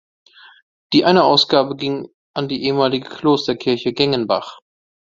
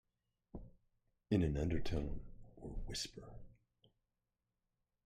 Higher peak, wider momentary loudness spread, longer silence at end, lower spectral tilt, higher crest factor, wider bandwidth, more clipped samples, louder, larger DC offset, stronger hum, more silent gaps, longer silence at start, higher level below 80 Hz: first, 0 dBFS vs -22 dBFS; second, 12 LU vs 21 LU; second, 0.55 s vs 1.55 s; about the same, -5.5 dB/octave vs -6 dB/octave; about the same, 18 dB vs 22 dB; second, 7.6 kHz vs 15 kHz; neither; first, -17 LUFS vs -41 LUFS; neither; neither; first, 2.14-2.34 s vs none; first, 0.9 s vs 0.55 s; second, -58 dBFS vs -52 dBFS